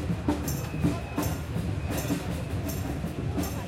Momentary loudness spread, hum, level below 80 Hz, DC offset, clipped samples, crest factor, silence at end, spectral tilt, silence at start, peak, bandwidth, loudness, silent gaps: 3 LU; none; -40 dBFS; under 0.1%; under 0.1%; 18 dB; 0 s; -6 dB/octave; 0 s; -12 dBFS; 16.5 kHz; -31 LUFS; none